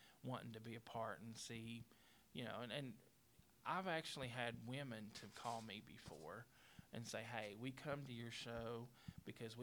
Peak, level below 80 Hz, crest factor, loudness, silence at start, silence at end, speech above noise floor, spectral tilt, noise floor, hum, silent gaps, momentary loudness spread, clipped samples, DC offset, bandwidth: -28 dBFS; -78 dBFS; 24 dB; -51 LUFS; 0 s; 0 s; 22 dB; -4.5 dB/octave; -73 dBFS; none; none; 11 LU; under 0.1%; under 0.1%; over 20 kHz